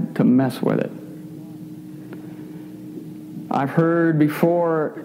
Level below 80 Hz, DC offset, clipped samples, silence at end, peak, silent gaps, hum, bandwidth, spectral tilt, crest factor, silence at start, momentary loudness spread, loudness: -68 dBFS; under 0.1%; under 0.1%; 0 s; -4 dBFS; none; none; 16 kHz; -8.5 dB/octave; 18 dB; 0 s; 19 LU; -19 LUFS